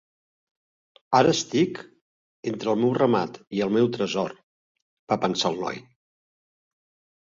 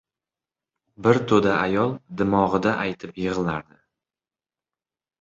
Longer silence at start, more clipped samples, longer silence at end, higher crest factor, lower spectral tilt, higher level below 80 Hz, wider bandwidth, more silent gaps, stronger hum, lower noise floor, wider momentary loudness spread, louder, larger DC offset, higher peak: about the same, 1.1 s vs 1 s; neither; second, 1.4 s vs 1.6 s; about the same, 22 dB vs 22 dB; second, -5 dB/octave vs -7 dB/octave; second, -66 dBFS vs -54 dBFS; about the same, 7.6 kHz vs 7.8 kHz; first, 2.01-2.43 s, 4.43-4.75 s, 4.82-5.07 s vs none; neither; about the same, under -90 dBFS vs under -90 dBFS; first, 12 LU vs 9 LU; about the same, -24 LUFS vs -22 LUFS; neither; about the same, -6 dBFS vs -4 dBFS